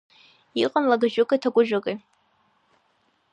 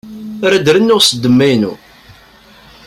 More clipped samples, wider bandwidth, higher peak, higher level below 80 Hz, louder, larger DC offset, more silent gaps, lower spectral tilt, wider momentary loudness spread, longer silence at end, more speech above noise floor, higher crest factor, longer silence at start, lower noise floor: neither; second, 9.2 kHz vs 16 kHz; second, -6 dBFS vs 0 dBFS; second, -76 dBFS vs -50 dBFS; second, -23 LUFS vs -11 LUFS; neither; neither; about the same, -5.5 dB/octave vs -4.5 dB/octave; about the same, 11 LU vs 10 LU; first, 1.35 s vs 1.1 s; first, 45 dB vs 32 dB; first, 20 dB vs 14 dB; first, 0.55 s vs 0.05 s; first, -67 dBFS vs -42 dBFS